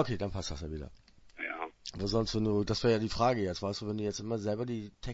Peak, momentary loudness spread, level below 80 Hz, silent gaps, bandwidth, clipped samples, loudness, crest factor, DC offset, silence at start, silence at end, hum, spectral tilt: -14 dBFS; 12 LU; -50 dBFS; none; 8 kHz; under 0.1%; -33 LUFS; 20 dB; under 0.1%; 0 s; 0 s; none; -5.5 dB/octave